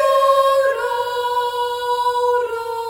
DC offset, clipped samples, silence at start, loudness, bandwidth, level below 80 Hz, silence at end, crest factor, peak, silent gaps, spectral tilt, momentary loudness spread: under 0.1%; under 0.1%; 0 s; -18 LUFS; 18 kHz; -58 dBFS; 0 s; 14 dB; -4 dBFS; none; -0.5 dB/octave; 7 LU